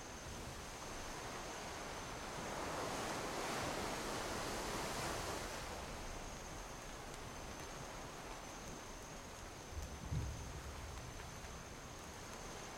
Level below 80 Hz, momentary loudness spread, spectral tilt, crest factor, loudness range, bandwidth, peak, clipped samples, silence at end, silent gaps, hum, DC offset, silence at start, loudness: -56 dBFS; 9 LU; -3.5 dB/octave; 16 dB; 7 LU; 16.5 kHz; -30 dBFS; under 0.1%; 0 s; none; none; under 0.1%; 0 s; -46 LUFS